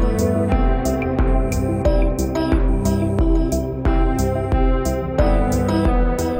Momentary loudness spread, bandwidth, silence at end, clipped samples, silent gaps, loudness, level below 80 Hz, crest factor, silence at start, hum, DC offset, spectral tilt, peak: 3 LU; 16.5 kHz; 0 s; under 0.1%; none; -19 LUFS; -20 dBFS; 14 dB; 0 s; none; under 0.1%; -7 dB/octave; -4 dBFS